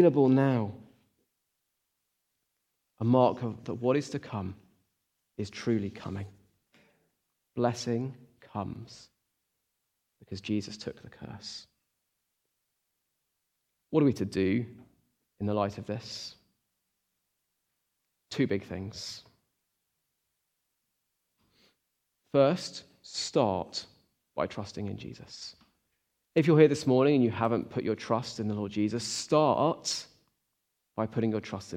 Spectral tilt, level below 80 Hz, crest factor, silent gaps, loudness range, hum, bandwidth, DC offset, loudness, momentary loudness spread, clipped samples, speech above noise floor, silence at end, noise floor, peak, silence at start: -6 dB/octave; -70 dBFS; 24 dB; none; 13 LU; none; 13.5 kHz; under 0.1%; -30 LUFS; 19 LU; under 0.1%; 53 dB; 0 s; -82 dBFS; -8 dBFS; 0 s